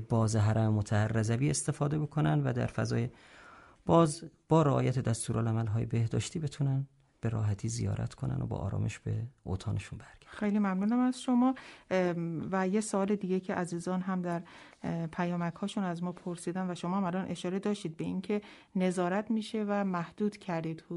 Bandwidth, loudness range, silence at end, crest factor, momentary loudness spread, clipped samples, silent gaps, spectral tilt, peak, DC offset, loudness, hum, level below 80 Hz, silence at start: 11.5 kHz; 5 LU; 0 s; 18 dB; 9 LU; under 0.1%; none; -6.5 dB/octave; -12 dBFS; under 0.1%; -32 LUFS; none; -58 dBFS; 0 s